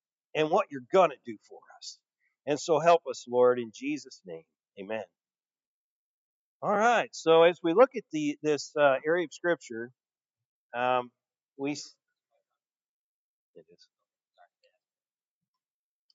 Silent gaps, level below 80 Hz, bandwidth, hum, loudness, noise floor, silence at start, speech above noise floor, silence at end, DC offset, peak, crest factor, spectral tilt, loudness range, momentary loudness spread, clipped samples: 5.67-6.60 s, 10.46-10.69 s, 11.43-11.47 s; under -90 dBFS; 7.8 kHz; none; -27 LUFS; under -90 dBFS; 0.35 s; over 63 dB; 4.25 s; under 0.1%; -8 dBFS; 22 dB; -4.5 dB/octave; 12 LU; 21 LU; under 0.1%